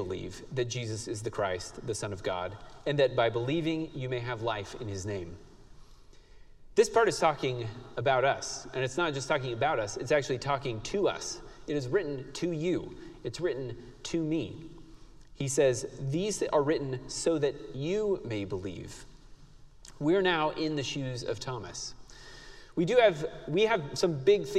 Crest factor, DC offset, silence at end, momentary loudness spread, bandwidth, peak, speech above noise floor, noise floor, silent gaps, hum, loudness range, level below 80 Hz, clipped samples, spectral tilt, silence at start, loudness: 20 dB; under 0.1%; 0 s; 13 LU; 13.5 kHz; -10 dBFS; 22 dB; -53 dBFS; none; none; 5 LU; -54 dBFS; under 0.1%; -5 dB/octave; 0 s; -31 LUFS